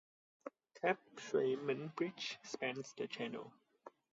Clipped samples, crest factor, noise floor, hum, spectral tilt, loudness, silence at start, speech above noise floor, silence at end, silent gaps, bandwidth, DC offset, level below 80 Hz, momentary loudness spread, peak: under 0.1%; 20 dB; -62 dBFS; none; -3 dB/octave; -41 LUFS; 0.45 s; 21 dB; 0.25 s; none; 7.6 kHz; under 0.1%; under -90 dBFS; 19 LU; -22 dBFS